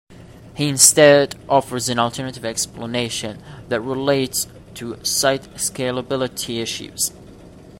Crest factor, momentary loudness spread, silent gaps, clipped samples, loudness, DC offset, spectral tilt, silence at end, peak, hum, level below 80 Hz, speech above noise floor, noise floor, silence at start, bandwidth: 20 dB; 15 LU; none; under 0.1%; -18 LUFS; under 0.1%; -2.5 dB/octave; 0.05 s; 0 dBFS; none; -52 dBFS; 22 dB; -42 dBFS; 0.1 s; 16.5 kHz